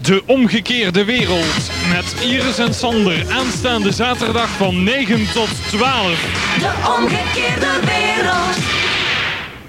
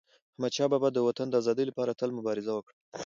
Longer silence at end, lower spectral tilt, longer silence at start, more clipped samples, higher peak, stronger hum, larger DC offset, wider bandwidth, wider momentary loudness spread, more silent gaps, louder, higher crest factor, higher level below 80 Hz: about the same, 0 s vs 0 s; second, -4 dB/octave vs -5.5 dB/octave; second, 0 s vs 0.4 s; neither; first, 0 dBFS vs -14 dBFS; neither; neither; first, 16.5 kHz vs 7.6 kHz; second, 3 LU vs 9 LU; second, none vs 2.73-2.92 s; first, -15 LUFS vs -30 LUFS; about the same, 16 dB vs 16 dB; first, -38 dBFS vs -78 dBFS